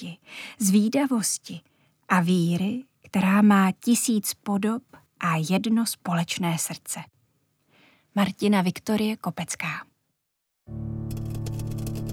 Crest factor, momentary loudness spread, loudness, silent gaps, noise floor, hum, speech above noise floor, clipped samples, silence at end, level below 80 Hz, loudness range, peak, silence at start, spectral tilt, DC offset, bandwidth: 20 dB; 14 LU; -25 LUFS; none; -79 dBFS; none; 55 dB; under 0.1%; 0 s; -52 dBFS; 5 LU; -4 dBFS; 0 s; -5 dB/octave; under 0.1%; 18 kHz